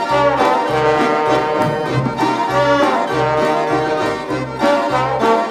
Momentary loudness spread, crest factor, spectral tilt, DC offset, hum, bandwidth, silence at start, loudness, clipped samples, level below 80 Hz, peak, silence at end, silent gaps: 4 LU; 14 dB; -5.5 dB/octave; under 0.1%; none; 14.5 kHz; 0 s; -16 LUFS; under 0.1%; -46 dBFS; -2 dBFS; 0 s; none